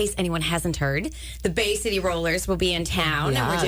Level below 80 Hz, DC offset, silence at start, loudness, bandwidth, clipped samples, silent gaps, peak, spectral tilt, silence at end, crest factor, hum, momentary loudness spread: -38 dBFS; under 0.1%; 0 s; -24 LUFS; 19.5 kHz; under 0.1%; none; -12 dBFS; -4 dB/octave; 0 s; 12 dB; none; 4 LU